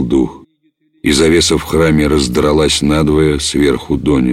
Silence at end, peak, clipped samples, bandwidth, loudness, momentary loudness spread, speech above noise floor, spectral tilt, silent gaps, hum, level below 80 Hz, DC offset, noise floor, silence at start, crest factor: 0 s; -2 dBFS; under 0.1%; 16 kHz; -12 LUFS; 5 LU; 47 dB; -5 dB/octave; none; none; -28 dBFS; under 0.1%; -58 dBFS; 0 s; 12 dB